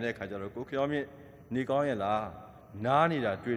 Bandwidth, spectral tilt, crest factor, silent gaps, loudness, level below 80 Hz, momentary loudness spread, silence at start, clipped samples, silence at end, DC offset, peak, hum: 12.5 kHz; -7 dB/octave; 20 dB; none; -31 LUFS; -64 dBFS; 16 LU; 0 s; under 0.1%; 0 s; under 0.1%; -12 dBFS; none